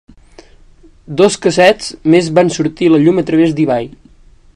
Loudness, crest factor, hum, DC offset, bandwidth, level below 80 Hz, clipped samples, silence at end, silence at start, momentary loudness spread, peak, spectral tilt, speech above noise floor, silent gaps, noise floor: -12 LUFS; 14 dB; none; under 0.1%; 11 kHz; -46 dBFS; 0.3%; 0.65 s; 1.1 s; 7 LU; 0 dBFS; -5.5 dB/octave; 32 dB; none; -43 dBFS